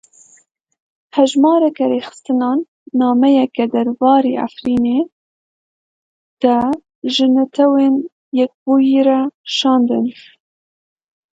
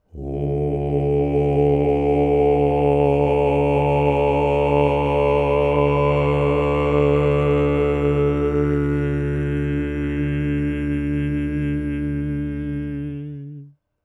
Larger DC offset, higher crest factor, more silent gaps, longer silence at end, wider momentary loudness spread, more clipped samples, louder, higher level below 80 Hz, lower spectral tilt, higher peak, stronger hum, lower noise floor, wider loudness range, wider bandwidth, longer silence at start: neither; about the same, 16 dB vs 14 dB; first, 2.68-2.86 s, 5.12-6.37 s, 6.95-7.02 s, 8.12-8.32 s, 8.54-8.66 s, 9.34-9.44 s vs none; first, 1.2 s vs 0.35 s; about the same, 9 LU vs 8 LU; neither; first, -15 LUFS vs -20 LUFS; second, -58 dBFS vs -32 dBFS; second, -5 dB/octave vs -9.5 dB/octave; first, 0 dBFS vs -6 dBFS; neither; first, -49 dBFS vs -42 dBFS; second, 3 LU vs 6 LU; first, 7.8 kHz vs 4.5 kHz; first, 1.15 s vs 0.15 s